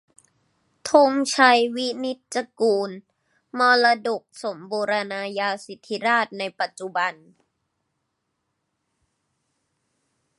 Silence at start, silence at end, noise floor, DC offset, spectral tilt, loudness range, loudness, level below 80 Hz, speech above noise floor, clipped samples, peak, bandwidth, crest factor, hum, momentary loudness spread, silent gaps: 0.85 s; 3.25 s; -77 dBFS; under 0.1%; -2.5 dB/octave; 11 LU; -22 LUFS; -78 dBFS; 55 dB; under 0.1%; -2 dBFS; 11.5 kHz; 22 dB; none; 16 LU; none